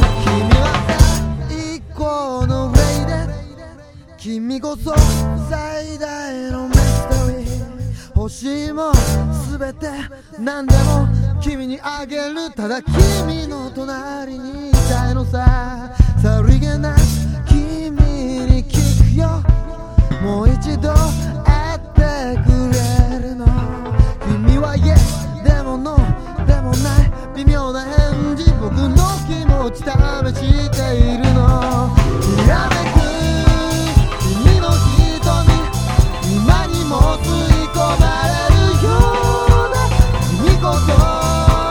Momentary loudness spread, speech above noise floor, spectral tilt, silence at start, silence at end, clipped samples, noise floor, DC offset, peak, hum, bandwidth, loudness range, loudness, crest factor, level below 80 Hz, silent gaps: 11 LU; 23 dB; -6 dB/octave; 0 s; 0 s; 0.3%; -39 dBFS; under 0.1%; 0 dBFS; none; 17 kHz; 5 LU; -16 LUFS; 14 dB; -18 dBFS; none